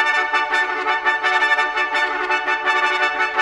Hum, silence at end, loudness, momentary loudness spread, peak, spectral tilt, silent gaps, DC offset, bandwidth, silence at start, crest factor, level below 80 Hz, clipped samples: none; 0 s; -18 LUFS; 3 LU; -2 dBFS; -0.5 dB/octave; none; under 0.1%; 12 kHz; 0 s; 16 dB; -58 dBFS; under 0.1%